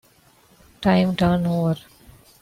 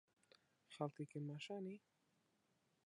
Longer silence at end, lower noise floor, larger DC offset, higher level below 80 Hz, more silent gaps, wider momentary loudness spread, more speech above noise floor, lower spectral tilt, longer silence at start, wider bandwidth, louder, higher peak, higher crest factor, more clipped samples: second, 0.65 s vs 1.1 s; second, -56 dBFS vs -83 dBFS; neither; first, -46 dBFS vs under -90 dBFS; neither; second, 7 LU vs 11 LU; about the same, 36 dB vs 34 dB; about the same, -7.5 dB/octave vs -6.5 dB/octave; about the same, 0.8 s vs 0.7 s; first, 15 kHz vs 11 kHz; first, -21 LUFS vs -50 LUFS; first, -6 dBFS vs -30 dBFS; second, 16 dB vs 24 dB; neither